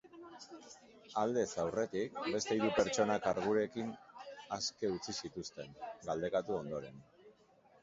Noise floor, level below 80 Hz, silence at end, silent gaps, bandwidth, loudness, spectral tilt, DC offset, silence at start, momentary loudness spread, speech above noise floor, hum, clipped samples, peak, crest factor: -67 dBFS; -70 dBFS; 0.5 s; none; 7.6 kHz; -37 LUFS; -4 dB/octave; under 0.1%; 0.05 s; 20 LU; 29 dB; none; under 0.1%; -16 dBFS; 22 dB